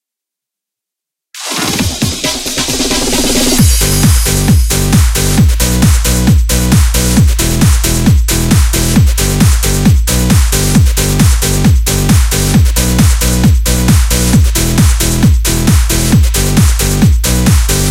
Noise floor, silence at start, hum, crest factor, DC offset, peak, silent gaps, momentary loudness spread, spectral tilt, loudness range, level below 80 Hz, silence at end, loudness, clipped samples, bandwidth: -82 dBFS; 1.35 s; none; 8 dB; under 0.1%; 0 dBFS; none; 2 LU; -4.5 dB/octave; 1 LU; -12 dBFS; 0 s; -10 LUFS; 0.2%; 17 kHz